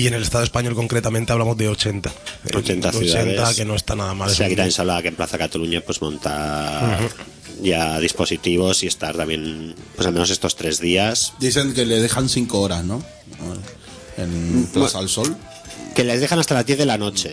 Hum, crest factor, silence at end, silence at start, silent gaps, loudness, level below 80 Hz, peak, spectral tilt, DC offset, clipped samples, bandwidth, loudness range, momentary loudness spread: none; 18 dB; 0 s; 0 s; none; -20 LUFS; -40 dBFS; -2 dBFS; -4 dB/octave; under 0.1%; under 0.1%; 11 kHz; 3 LU; 12 LU